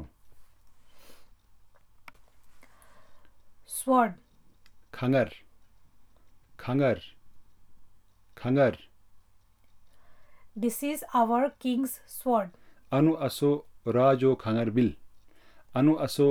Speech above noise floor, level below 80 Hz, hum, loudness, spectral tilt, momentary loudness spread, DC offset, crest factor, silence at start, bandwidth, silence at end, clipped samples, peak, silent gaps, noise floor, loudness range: 34 dB; -62 dBFS; none; -27 LUFS; -6.5 dB/octave; 10 LU; under 0.1%; 20 dB; 0 s; 19.5 kHz; 0 s; under 0.1%; -10 dBFS; none; -59 dBFS; 7 LU